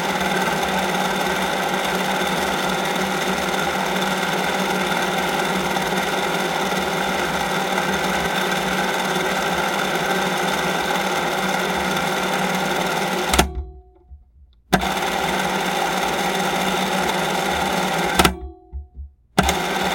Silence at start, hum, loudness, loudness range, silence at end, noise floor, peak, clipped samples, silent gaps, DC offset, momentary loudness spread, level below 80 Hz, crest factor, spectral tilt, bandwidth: 0 s; none; -20 LUFS; 2 LU; 0 s; -51 dBFS; 0 dBFS; under 0.1%; none; under 0.1%; 2 LU; -40 dBFS; 22 dB; -3.5 dB/octave; 17 kHz